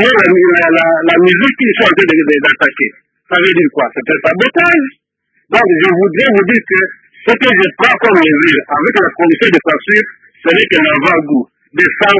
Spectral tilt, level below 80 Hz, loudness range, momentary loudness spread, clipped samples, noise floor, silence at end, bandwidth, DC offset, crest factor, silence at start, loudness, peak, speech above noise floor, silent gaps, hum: -6 dB/octave; -52 dBFS; 2 LU; 7 LU; 0.4%; -61 dBFS; 0 s; 8 kHz; under 0.1%; 10 dB; 0 s; -9 LUFS; 0 dBFS; 51 dB; none; none